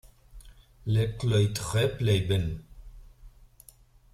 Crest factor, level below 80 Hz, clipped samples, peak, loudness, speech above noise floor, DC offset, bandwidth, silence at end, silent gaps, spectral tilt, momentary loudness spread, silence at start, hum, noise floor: 16 dB; -48 dBFS; under 0.1%; -12 dBFS; -27 LUFS; 31 dB; under 0.1%; 14 kHz; 0.85 s; none; -6 dB/octave; 10 LU; 0.35 s; none; -56 dBFS